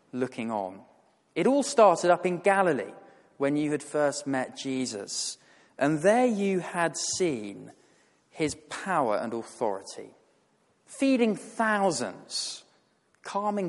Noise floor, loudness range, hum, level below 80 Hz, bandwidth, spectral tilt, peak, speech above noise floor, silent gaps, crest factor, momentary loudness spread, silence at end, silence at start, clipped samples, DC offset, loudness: -68 dBFS; 6 LU; none; -72 dBFS; 11.5 kHz; -4 dB/octave; -8 dBFS; 41 dB; none; 20 dB; 14 LU; 0 s; 0.15 s; under 0.1%; under 0.1%; -27 LUFS